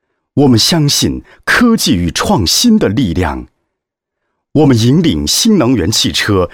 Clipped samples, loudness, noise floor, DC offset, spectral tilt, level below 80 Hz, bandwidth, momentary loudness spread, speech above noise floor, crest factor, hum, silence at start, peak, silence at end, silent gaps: under 0.1%; -11 LUFS; -76 dBFS; under 0.1%; -4.5 dB/octave; -32 dBFS; 17.5 kHz; 8 LU; 65 dB; 12 dB; none; 0.35 s; 0 dBFS; 0.05 s; none